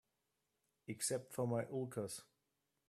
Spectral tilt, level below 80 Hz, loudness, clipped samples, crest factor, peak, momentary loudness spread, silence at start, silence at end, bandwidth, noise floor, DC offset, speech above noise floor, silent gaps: -4.5 dB/octave; -82 dBFS; -43 LUFS; under 0.1%; 18 dB; -26 dBFS; 12 LU; 0.9 s; 0.65 s; 15 kHz; -87 dBFS; under 0.1%; 45 dB; none